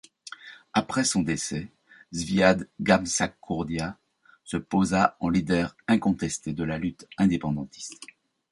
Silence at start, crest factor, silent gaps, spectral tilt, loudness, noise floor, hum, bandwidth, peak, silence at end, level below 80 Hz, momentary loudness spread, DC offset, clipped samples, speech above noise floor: 0.25 s; 24 dB; none; -5 dB/octave; -26 LUFS; -46 dBFS; none; 11.5 kHz; -4 dBFS; 0.45 s; -52 dBFS; 17 LU; under 0.1%; under 0.1%; 20 dB